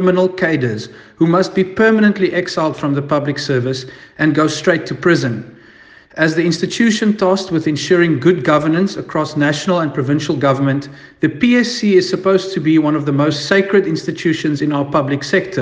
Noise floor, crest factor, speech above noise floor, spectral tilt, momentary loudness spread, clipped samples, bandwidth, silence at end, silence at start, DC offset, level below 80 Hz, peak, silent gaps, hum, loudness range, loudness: -43 dBFS; 14 dB; 28 dB; -6 dB/octave; 7 LU; under 0.1%; 9.6 kHz; 0 s; 0 s; under 0.1%; -54 dBFS; 0 dBFS; none; none; 2 LU; -15 LUFS